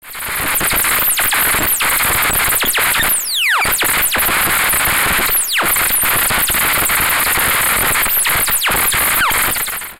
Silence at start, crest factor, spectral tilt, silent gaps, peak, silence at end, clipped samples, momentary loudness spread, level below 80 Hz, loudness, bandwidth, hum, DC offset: 0.05 s; 12 dB; -0.5 dB/octave; none; -2 dBFS; 0.05 s; under 0.1%; 1 LU; -34 dBFS; -12 LUFS; 17 kHz; none; under 0.1%